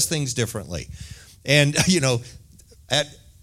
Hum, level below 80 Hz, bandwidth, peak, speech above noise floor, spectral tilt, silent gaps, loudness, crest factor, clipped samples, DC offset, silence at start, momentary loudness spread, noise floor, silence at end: none; -48 dBFS; 16 kHz; -2 dBFS; 27 dB; -3.5 dB/octave; none; -21 LUFS; 22 dB; under 0.1%; under 0.1%; 0 s; 19 LU; -49 dBFS; 0.3 s